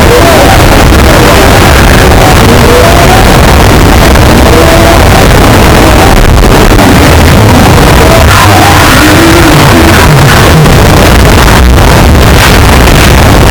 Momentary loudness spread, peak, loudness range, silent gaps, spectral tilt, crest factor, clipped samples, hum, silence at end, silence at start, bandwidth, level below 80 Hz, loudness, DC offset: 1 LU; 0 dBFS; 1 LU; none; -5 dB/octave; 0 dB; 30%; none; 0 s; 0 s; over 20 kHz; -6 dBFS; -2 LUFS; under 0.1%